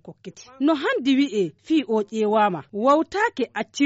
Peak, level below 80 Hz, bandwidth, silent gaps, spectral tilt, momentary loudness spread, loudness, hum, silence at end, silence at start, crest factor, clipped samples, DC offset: -8 dBFS; -66 dBFS; 8 kHz; none; -3.5 dB/octave; 8 LU; -22 LUFS; none; 0 s; 0.05 s; 14 dB; under 0.1%; under 0.1%